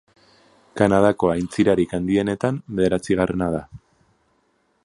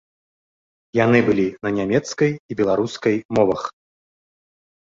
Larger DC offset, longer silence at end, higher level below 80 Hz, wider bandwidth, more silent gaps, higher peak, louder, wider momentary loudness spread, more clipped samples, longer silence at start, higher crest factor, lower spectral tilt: neither; second, 1.05 s vs 1.25 s; first, -46 dBFS vs -54 dBFS; first, 11.5 kHz vs 7.8 kHz; second, none vs 2.40-2.49 s, 3.25-3.29 s; about the same, -2 dBFS vs -2 dBFS; about the same, -21 LUFS vs -20 LUFS; about the same, 7 LU vs 7 LU; neither; second, 0.75 s vs 0.95 s; about the same, 20 dB vs 18 dB; about the same, -7 dB/octave vs -6.5 dB/octave